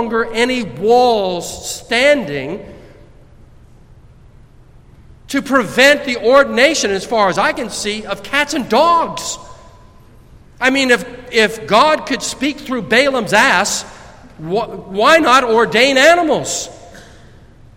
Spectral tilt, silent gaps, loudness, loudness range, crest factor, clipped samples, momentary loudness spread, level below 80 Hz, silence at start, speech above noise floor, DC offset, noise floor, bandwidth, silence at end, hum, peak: -3 dB/octave; none; -14 LUFS; 7 LU; 16 dB; under 0.1%; 13 LU; -44 dBFS; 0 s; 29 dB; under 0.1%; -43 dBFS; 16.5 kHz; 0.75 s; none; 0 dBFS